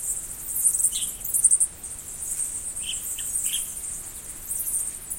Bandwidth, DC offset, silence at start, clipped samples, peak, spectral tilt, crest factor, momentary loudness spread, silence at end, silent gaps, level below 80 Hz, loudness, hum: 17 kHz; under 0.1%; 0 s; under 0.1%; -4 dBFS; 1 dB/octave; 24 dB; 14 LU; 0 s; none; -50 dBFS; -24 LUFS; none